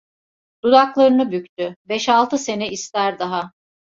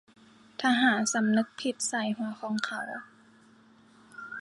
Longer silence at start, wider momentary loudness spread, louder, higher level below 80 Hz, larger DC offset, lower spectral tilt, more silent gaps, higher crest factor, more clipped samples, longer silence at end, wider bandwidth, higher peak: about the same, 0.65 s vs 0.6 s; second, 12 LU vs 18 LU; first, -18 LUFS vs -28 LUFS; first, -64 dBFS vs -80 dBFS; neither; about the same, -4 dB/octave vs -3 dB/octave; first, 1.49-1.57 s, 1.76-1.85 s vs none; about the same, 18 dB vs 20 dB; neither; first, 0.5 s vs 0 s; second, 7.8 kHz vs 11.5 kHz; first, -2 dBFS vs -12 dBFS